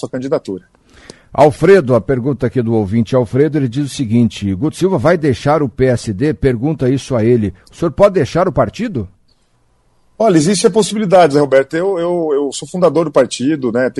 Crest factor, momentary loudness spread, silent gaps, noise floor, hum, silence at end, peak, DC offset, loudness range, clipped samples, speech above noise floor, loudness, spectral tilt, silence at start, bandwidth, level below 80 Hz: 14 dB; 9 LU; none; -56 dBFS; none; 0 s; 0 dBFS; under 0.1%; 3 LU; under 0.1%; 43 dB; -14 LUFS; -6.5 dB/octave; 0 s; 12 kHz; -40 dBFS